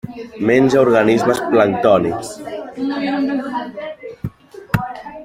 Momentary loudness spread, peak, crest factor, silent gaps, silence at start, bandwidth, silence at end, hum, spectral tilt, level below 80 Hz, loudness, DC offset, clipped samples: 17 LU; -2 dBFS; 16 dB; none; 0.05 s; 16 kHz; 0 s; none; -6.5 dB/octave; -48 dBFS; -16 LUFS; under 0.1%; under 0.1%